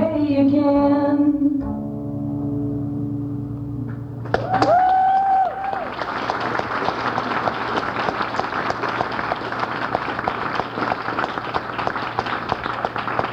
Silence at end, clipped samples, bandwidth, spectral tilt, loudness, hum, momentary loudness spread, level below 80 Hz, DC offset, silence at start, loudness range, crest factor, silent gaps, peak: 0 s; under 0.1%; 7.8 kHz; -7 dB/octave; -22 LUFS; none; 10 LU; -46 dBFS; under 0.1%; 0 s; 4 LU; 20 dB; none; -2 dBFS